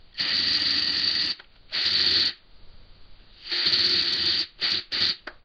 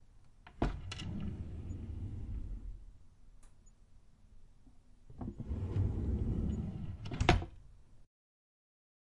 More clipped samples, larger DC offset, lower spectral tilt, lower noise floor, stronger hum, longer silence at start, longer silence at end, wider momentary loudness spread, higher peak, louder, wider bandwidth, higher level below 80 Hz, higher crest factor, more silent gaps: neither; neither; second, -1.5 dB/octave vs -6.5 dB/octave; second, -47 dBFS vs -60 dBFS; neither; about the same, 0.05 s vs 0.15 s; second, 0.1 s vs 1 s; second, 6 LU vs 17 LU; about the same, -10 dBFS vs -10 dBFS; first, -22 LUFS vs -39 LUFS; first, 12.5 kHz vs 11 kHz; second, -56 dBFS vs -44 dBFS; second, 18 dB vs 30 dB; neither